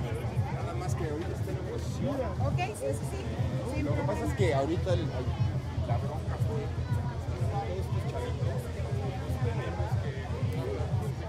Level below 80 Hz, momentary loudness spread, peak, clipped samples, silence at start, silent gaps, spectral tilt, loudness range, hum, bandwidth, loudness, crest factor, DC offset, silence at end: -44 dBFS; 5 LU; -16 dBFS; under 0.1%; 0 s; none; -7 dB/octave; 2 LU; none; 14 kHz; -32 LUFS; 16 dB; under 0.1%; 0 s